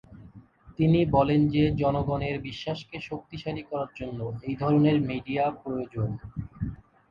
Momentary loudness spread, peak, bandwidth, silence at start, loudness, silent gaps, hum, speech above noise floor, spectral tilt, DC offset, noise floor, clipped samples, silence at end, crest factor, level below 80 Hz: 15 LU; -8 dBFS; 7 kHz; 0.1 s; -27 LUFS; none; none; 25 dB; -9 dB/octave; under 0.1%; -51 dBFS; under 0.1%; 0.35 s; 18 dB; -48 dBFS